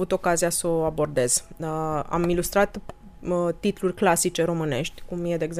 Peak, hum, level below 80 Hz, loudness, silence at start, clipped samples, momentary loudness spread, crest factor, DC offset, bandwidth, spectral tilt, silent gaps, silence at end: -6 dBFS; none; -44 dBFS; -24 LUFS; 0 s; under 0.1%; 8 LU; 18 dB; under 0.1%; 15.5 kHz; -4.5 dB/octave; none; 0 s